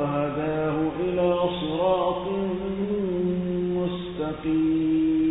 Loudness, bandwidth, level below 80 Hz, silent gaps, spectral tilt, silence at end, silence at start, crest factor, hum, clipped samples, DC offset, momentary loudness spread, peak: -25 LUFS; 4 kHz; -48 dBFS; none; -11.5 dB/octave; 0 s; 0 s; 12 dB; none; under 0.1%; under 0.1%; 6 LU; -12 dBFS